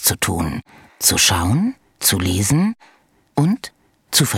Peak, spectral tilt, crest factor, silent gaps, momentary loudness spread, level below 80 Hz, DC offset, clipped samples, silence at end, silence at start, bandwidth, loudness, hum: -2 dBFS; -3.5 dB/octave; 18 dB; none; 12 LU; -44 dBFS; under 0.1%; under 0.1%; 0 s; 0 s; 17.5 kHz; -18 LUFS; none